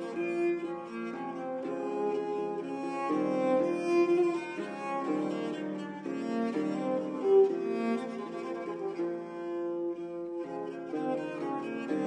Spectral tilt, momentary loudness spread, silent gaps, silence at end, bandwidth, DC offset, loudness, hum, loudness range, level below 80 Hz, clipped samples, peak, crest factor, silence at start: -7 dB/octave; 11 LU; none; 0 s; 9.8 kHz; under 0.1%; -32 LUFS; none; 5 LU; -82 dBFS; under 0.1%; -14 dBFS; 18 dB; 0 s